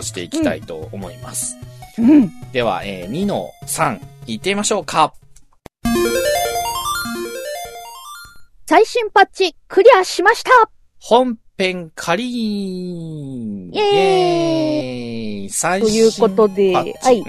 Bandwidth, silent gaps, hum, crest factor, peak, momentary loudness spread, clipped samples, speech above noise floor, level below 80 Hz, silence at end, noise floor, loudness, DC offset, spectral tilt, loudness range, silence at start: 14 kHz; none; none; 18 dB; 0 dBFS; 16 LU; under 0.1%; 28 dB; -46 dBFS; 0 s; -44 dBFS; -17 LUFS; under 0.1%; -4 dB/octave; 6 LU; 0 s